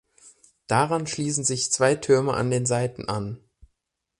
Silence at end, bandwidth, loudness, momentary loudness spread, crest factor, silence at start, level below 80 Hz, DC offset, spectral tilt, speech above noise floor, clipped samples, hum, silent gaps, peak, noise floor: 0.85 s; 11.5 kHz; -23 LUFS; 9 LU; 18 dB; 0.25 s; -56 dBFS; under 0.1%; -4 dB/octave; 55 dB; under 0.1%; none; none; -6 dBFS; -78 dBFS